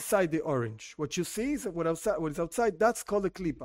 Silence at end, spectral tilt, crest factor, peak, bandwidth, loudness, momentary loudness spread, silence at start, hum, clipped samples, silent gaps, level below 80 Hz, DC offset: 0 s; -5 dB/octave; 18 dB; -12 dBFS; 16 kHz; -31 LUFS; 6 LU; 0 s; none; under 0.1%; none; -56 dBFS; under 0.1%